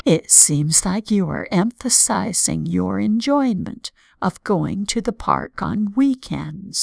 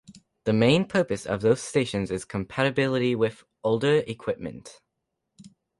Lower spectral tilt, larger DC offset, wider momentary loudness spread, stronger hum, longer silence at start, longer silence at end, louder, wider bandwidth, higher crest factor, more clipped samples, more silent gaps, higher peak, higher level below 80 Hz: second, -3.5 dB/octave vs -6 dB/octave; neither; first, 14 LU vs 11 LU; neither; about the same, 0.05 s vs 0.1 s; second, 0 s vs 1.05 s; first, -18 LUFS vs -25 LUFS; about the same, 11 kHz vs 11.5 kHz; about the same, 18 dB vs 18 dB; neither; neither; first, 0 dBFS vs -8 dBFS; first, -46 dBFS vs -56 dBFS